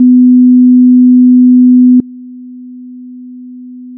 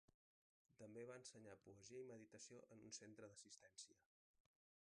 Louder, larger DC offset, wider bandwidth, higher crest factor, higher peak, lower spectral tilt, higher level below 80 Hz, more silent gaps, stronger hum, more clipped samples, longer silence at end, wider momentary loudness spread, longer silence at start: first, -5 LUFS vs -61 LUFS; neither; second, 0.5 kHz vs 10 kHz; second, 6 dB vs 22 dB; first, 0 dBFS vs -42 dBFS; first, -15.5 dB/octave vs -3.5 dB/octave; first, -60 dBFS vs under -90 dBFS; second, none vs 0.14-0.65 s; first, 50 Hz at -65 dBFS vs none; neither; second, 0 s vs 0.85 s; second, 1 LU vs 6 LU; about the same, 0 s vs 0.1 s